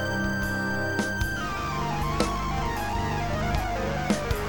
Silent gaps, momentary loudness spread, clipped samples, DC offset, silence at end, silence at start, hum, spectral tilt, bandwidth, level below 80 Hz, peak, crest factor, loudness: none; 2 LU; under 0.1%; 0.7%; 0 s; 0 s; none; -5 dB/octave; over 20 kHz; -36 dBFS; -8 dBFS; 18 dB; -28 LUFS